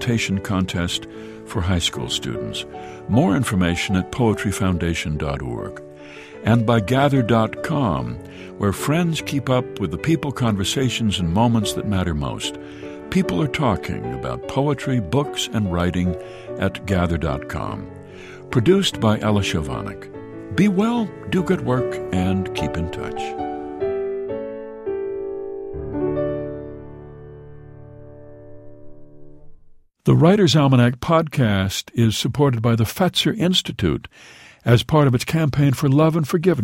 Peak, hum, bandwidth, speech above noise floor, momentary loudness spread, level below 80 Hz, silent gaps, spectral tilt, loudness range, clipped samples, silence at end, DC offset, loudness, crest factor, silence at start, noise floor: 0 dBFS; none; 16 kHz; 28 dB; 15 LU; -42 dBFS; none; -6 dB/octave; 9 LU; under 0.1%; 0 s; under 0.1%; -21 LUFS; 20 dB; 0 s; -48 dBFS